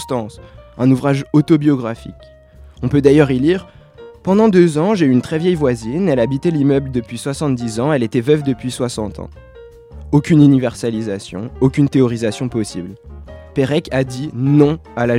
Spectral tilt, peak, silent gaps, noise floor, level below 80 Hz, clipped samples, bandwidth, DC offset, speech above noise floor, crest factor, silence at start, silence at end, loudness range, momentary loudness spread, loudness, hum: -7.5 dB/octave; 0 dBFS; none; -39 dBFS; -40 dBFS; under 0.1%; 12.5 kHz; under 0.1%; 24 dB; 16 dB; 0 s; 0 s; 4 LU; 14 LU; -16 LUFS; none